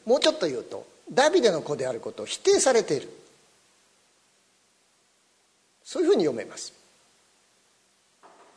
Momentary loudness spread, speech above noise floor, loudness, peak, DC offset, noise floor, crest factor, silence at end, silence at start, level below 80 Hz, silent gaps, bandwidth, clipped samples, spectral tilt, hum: 18 LU; 41 dB; -24 LUFS; -4 dBFS; under 0.1%; -66 dBFS; 24 dB; 1.9 s; 0.05 s; -72 dBFS; none; 11 kHz; under 0.1%; -3 dB/octave; 60 Hz at -65 dBFS